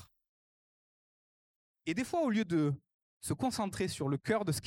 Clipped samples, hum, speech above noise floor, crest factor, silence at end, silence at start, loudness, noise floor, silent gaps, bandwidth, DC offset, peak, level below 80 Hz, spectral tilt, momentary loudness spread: under 0.1%; none; over 57 dB; 18 dB; 0 s; 0 s; -34 LUFS; under -90 dBFS; 0.28-1.74 s, 2.94-3.20 s; 17 kHz; under 0.1%; -18 dBFS; -66 dBFS; -5.5 dB/octave; 10 LU